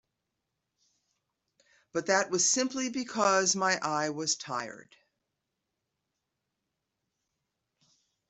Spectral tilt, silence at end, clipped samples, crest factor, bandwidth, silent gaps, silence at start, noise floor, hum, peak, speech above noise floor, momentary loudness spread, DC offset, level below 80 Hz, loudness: -2 dB/octave; 3.5 s; under 0.1%; 22 dB; 8.2 kHz; none; 1.95 s; -85 dBFS; none; -12 dBFS; 55 dB; 11 LU; under 0.1%; -78 dBFS; -28 LUFS